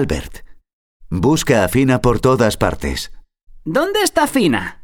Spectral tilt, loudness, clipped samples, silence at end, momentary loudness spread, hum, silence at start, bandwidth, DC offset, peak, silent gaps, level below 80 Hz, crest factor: -5 dB/octave; -16 LUFS; under 0.1%; 0 s; 12 LU; none; 0 s; 19.5 kHz; under 0.1%; 0 dBFS; 0.73-1.00 s; -32 dBFS; 16 dB